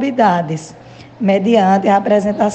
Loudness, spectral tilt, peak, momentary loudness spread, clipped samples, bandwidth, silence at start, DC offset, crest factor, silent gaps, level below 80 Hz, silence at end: -14 LUFS; -6.5 dB/octave; 0 dBFS; 9 LU; under 0.1%; 8.6 kHz; 0 s; under 0.1%; 14 dB; none; -54 dBFS; 0 s